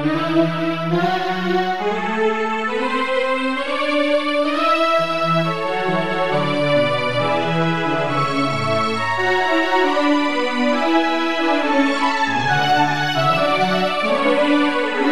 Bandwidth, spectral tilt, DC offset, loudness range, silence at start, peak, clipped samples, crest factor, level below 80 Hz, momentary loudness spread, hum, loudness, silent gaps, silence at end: 13.5 kHz; -5.5 dB/octave; 2%; 2 LU; 0 s; -4 dBFS; under 0.1%; 14 dB; -62 dBFS; 4 LU; none; -18 LUFS; none; 0 s